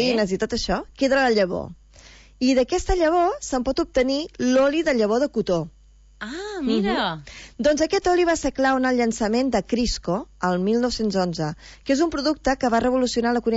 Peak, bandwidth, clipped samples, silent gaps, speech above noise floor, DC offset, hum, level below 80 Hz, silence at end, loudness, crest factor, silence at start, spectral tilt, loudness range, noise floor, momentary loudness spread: -8 dBFS; 8 kHz; under 0.1%; none; 26 dB; under 0.1%; none; -40 dBFS; 0 s; -22 LUFS; 14 dB; 0 s; -4.5 dB/octave; 2 LU; -48 dBFS; 8 LU